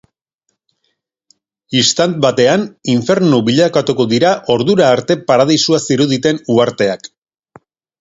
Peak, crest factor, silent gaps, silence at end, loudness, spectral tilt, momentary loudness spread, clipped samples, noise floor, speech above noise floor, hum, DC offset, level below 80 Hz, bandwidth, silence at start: 0 dBFS; 14 dB; none; 0.95 s; -13 LUFS; -4.5 dB/octave; 5 LU; under 0.1%; -70 dBFS; 57 dB; none; under 0.1%; -54 dBFS; 8 kHz; 1.7 s